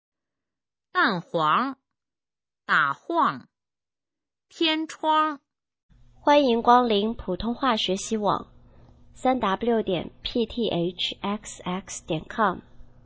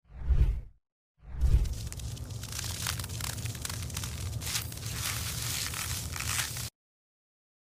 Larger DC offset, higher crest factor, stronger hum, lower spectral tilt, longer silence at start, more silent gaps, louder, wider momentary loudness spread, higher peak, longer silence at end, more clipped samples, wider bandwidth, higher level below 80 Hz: neither; about the same, 22 dB vs 22 dB; neither; first, -4.5 dB/octave vs -2.5 dB/octave; first, 0.95 s vs 0.1 s; second, 5.83-5.89 s vs 0.92-1.15 s; first, -24 LUFS vs -33 LUFS; first, 12 LU vs 9 LU; first, -4 dBFS vs -10 dBFS; second, 0.2 s vs 1.05 s; neither; second, 8 kHz vs 16 kHz; second, -54 dBFS vs -36 dBFS